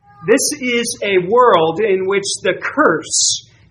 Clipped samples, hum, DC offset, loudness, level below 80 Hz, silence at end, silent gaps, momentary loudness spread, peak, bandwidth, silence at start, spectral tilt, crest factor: under 0.1%; none; under 0.1%; -15 LUFS; -58 dBFS; 0.3 s; none; 6 LU; 0 dBFS; 13 kHz; 0.2 s; -2.5 dB/octave; 16 dB